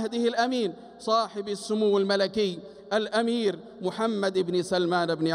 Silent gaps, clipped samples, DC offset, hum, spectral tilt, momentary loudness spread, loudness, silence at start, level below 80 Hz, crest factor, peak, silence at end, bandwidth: none; under 0.1%; under 0.1%; none; -5 dB/octave; 9 LU; -27 LUFS; 0 s; -68 dBFS; 14 dB; -12 dBFS; 0 s; 13.5 kHz